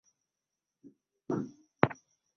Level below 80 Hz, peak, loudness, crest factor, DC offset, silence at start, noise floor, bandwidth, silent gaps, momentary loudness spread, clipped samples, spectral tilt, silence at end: -68 dBFS; -2 dBFS; -34 LUFS; 36 dB; under 0.1%; 0.85 s; -89 dBFS; 6.6 kHz; none; 15 LU; under 0.1%; -6 dB/octave; 0.45 s